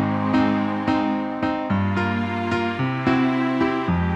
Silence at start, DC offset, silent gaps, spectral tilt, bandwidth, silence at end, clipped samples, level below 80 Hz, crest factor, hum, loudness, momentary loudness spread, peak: 0 s; under 0.1%; none; -8 dB/octave; 8 kHz; 0 s; under 0.1%; -46 dBFS; 14 dB; none; -22 LUFS; 4 LU; -6 dBFS